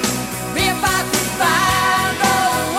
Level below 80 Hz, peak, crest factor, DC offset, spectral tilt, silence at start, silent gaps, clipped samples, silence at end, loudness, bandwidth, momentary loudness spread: -40 dBFS; 0 dBFS; 16 dB; 0.2%; -2.5 dB/octave; 0 s; none; under 0.1%; 0 s; -16 LUFS; 16.5 kHz; 5 LU